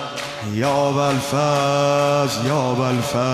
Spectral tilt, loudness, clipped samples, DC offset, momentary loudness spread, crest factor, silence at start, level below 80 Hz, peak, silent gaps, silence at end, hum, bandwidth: -5 dB/octave; -19 LUFS; under 0.1%; under 0.1%; 5 LU; 14 dB; 0 s; -54 dBFS; -6 dBFS; none; 0 s; none; 14 kHz